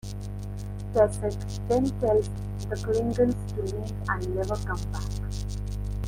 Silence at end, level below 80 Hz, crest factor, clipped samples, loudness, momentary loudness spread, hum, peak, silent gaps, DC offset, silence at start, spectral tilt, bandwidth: 0 s; -36 dBFS; 18 dB; under 0.1%; -29 LUFS; 11 LU; 50 Hz at -35 dBFS; -8 dBFS; none; under 0.1%; 0.05 s; -7 dB/octave; 16 kHz